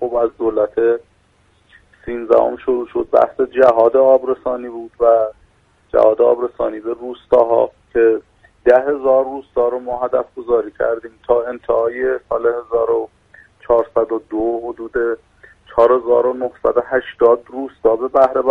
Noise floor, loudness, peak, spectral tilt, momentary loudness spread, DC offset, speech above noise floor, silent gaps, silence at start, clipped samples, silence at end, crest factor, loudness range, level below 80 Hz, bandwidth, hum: -56 dBFS; -16 LUFS; 0 dBFS; -7.5 dB/octave; 11 LU; under 0.1%; 40 dB; none; 0 s; under 0.1%; 0 s; 16 dB; 4 LU; -48 dBFS; 4.5 kHz; none